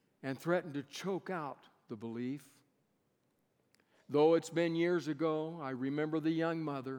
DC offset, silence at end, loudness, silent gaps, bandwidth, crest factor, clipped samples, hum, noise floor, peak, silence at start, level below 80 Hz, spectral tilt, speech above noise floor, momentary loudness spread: under 0.1%; 0 s; -35 LUFS; none; 18 kHz; 18 dB; under 0.1%; none; -78 dBFS; -18 dBFS; 0.25 s; under -90 dBFS; -6.5 dB/octave; 43 dB; 14 LU